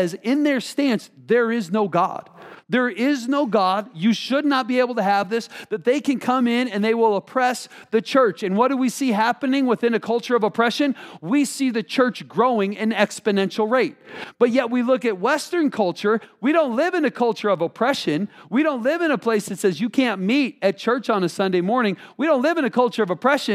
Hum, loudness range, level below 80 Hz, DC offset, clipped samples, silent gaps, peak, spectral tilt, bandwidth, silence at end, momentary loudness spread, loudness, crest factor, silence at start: none; 1 LU; -78 dBFS; under 0.1%; under 0.1%; none; -2 dBFS; -5 dB/octave; 15 kHz; 0 s; 4 LU; -21 LUFS; 18 dB; 0 s